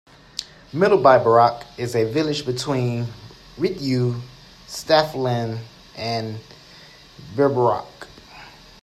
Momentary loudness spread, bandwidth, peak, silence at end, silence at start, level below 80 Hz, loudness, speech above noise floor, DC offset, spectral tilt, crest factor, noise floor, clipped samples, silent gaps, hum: 25 LU; 13.5 kHz; 0 dBFS; 0.35 s; 0.35 s; -54 dBFS; -20 LUFS; 26 dB; under 0.1%; -6 dB/octave; 22 dB; -46 dBFS; under 0.1%; none; none